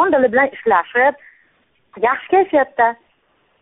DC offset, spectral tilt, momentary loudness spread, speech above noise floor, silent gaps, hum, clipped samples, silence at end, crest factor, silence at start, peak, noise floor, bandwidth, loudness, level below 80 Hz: under 0.1%; -2.5 dB/octave; 5 LU; 45 dB; none; none; under 0.1%; 0.7 s; 16 dB; 0 s; -2 dBFS; -61 dBFS; 4 kHz; -16 LUFS; -58 dBFS